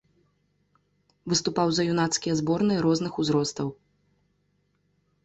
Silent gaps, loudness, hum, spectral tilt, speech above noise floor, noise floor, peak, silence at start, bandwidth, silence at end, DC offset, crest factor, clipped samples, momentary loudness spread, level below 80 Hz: none; -25 LUFS; none; -4.5 dB/octave; 46 dB; -71 dBFS; -10 dBFS; 1.25 s; 8.4 kHz; 1.5 s; under 0.1%; 18 dB; under 0.1%; 8 LU; -62 dBFS